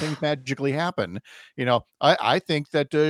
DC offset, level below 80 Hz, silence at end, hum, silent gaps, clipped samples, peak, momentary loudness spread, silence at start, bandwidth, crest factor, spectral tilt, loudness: under 0.1%; -66 dBFS; 0 s; none; none; under 0.1%; -4 dBFS; 10 LU; 0 s; 13.5 kHz; 20 dB; -5.5 dB/octave; -24 LUFS